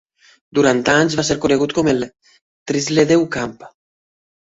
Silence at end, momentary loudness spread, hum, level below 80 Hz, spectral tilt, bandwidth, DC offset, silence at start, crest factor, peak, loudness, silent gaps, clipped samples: 0.9 s; 11 LU; none; -50 dBFS; -4.5 dB/octave; 8 kHz; under 0.1%; 0.55 s; 16 dB; -2 dBFS; -17 LUFS; 2.41-2.66 s; under 0.1%